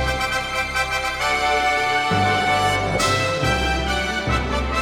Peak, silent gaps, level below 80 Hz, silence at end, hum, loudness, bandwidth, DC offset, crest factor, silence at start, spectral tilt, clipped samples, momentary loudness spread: -6 dBFS; none; -32 dBFS; 0 s; none; -20 LUFS; 18.5 kHz; under 0.1%; 14 dB; 0 s; -3.5 dB/octave; under 0.1%; 4 LU